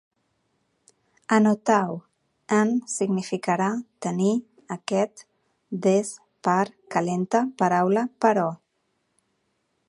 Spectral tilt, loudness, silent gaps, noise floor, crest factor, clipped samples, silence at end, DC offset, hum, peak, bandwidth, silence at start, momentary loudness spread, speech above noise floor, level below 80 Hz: -6 dB/octave; -24 LUFS; none; -73 dBFS; 20 dB; under 0.1%; 1.35 s; under 0.1%; none; -4 dBFS; 11.5 kHz; 1.3 s; 11 LU; 50 dB; -74 dBFS